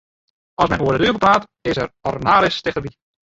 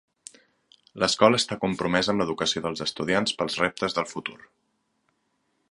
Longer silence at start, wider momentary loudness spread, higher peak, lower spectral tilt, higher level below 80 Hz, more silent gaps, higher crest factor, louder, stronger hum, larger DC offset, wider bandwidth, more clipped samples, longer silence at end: second, 0.6 s vs 0.95 s; about the same, 11 LU vs 9 LU; about the same, 0 dBFS vs -2 dBFS; first, -5.5 dB/octave vs -3.5 dB/octave; first, -44 dBFS vs -58 dBFS; neither; second, 18 dB vs 26 dB; first, -18 LUFS vs -25 LUFS; neither; neither; second, 8 kHz vs 11.5 kHz; neither; second, 0.4 s vs 1.35 s